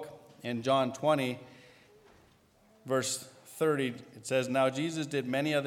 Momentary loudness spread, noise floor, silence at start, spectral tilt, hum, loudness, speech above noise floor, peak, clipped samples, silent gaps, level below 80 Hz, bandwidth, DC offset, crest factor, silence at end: 15 LU; -64 dBFS; 0 s; -4.5 dB/octave; none; -31 LUFS; 33 dB; -14 dBFS; under 0.1%; none; -76 dBFS; 18.5 kHz; under 0.1%; 18 dB; 0 s